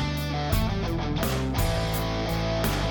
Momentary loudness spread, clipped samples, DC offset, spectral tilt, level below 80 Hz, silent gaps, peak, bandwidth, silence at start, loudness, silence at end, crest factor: 2 LU; under 0.1%; under 0.1%; -5.5 dB/octave; -32 dBFS; none; -12 dBFS; 19 kHz; 0 s; -27 LUFS; 0 s; 14 dB